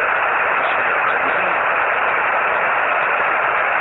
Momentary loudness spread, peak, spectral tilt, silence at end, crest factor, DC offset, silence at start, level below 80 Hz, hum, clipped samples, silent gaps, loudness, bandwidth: 0 LU; -4 dBFS; -5 dB/octave; 0 s; 14 dB; under 0.1%; 0 s; -58 dBFS; none; under 0.1%; none; -16 LUFS; 7 kHz